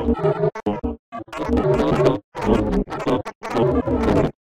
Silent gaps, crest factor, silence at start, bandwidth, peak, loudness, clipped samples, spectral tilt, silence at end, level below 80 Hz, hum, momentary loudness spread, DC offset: 0.99-1.12 s, 2.24-2.32 s, 3.35-3.41 s; 18 dB; 0 s; 12.5 kHz; -2 dBFS; -21 LUFS; under 0.1%; -8 dB/octave; 0.15 s; -32 dBFS; none; 9 LU; under 0.1%